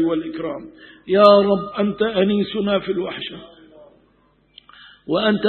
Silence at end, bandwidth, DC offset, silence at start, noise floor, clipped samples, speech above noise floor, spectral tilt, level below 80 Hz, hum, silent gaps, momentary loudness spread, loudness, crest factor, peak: 0 s; 4.4 kHz; under 0.1%; 0 s; -59 dBFS; under 0.1%; 40 dB; -8 dB/octave; -56 dBFS; none; none; 20 LU; -18 LUFS; 20 dB; 0 dBFS